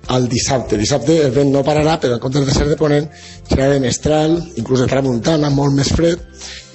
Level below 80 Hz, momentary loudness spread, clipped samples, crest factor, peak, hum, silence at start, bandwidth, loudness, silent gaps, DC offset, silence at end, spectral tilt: -32 dBFS; 6 LU; under 0.1%; 12 dB; -2 dBFS; none; 0.05 s; 8.4 kHz; -15 LUFS; none; under 0.1%; 0.1 s; -5.5 dB/octave